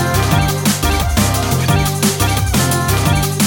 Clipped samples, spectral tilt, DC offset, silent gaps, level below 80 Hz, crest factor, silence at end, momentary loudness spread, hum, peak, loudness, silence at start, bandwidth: under 0.1%; -4.5 dB/octave; under 0.1%; none; -24 dBFS; 14 dB; 0 s; 1 LU; none; -2 dBFS; -14 LUFS; 0 s; 17 kHz